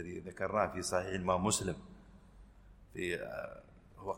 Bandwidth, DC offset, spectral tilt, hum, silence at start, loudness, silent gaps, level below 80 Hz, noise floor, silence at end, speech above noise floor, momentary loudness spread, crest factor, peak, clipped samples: 16 kHz; under 0.1%; -4 dB/octave; none; 0 s; -36 LUFS; none; -58 dBFS; -58 dBFS; 0 s; 22 dB; 17 LU; 22 dB; -16 dBFS; under 0.1%